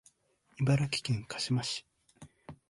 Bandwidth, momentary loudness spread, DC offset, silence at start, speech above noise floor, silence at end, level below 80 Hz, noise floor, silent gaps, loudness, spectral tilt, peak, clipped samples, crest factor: 11.5 kHz; 16 LU; under 0.1%; 0.6 s; 38 dB; 0.15 s; -62 dBFS; -69 dBFS; none; -32 LUFS; -5 dB/octave; -16 dBFS; under 0.1%; 18 dB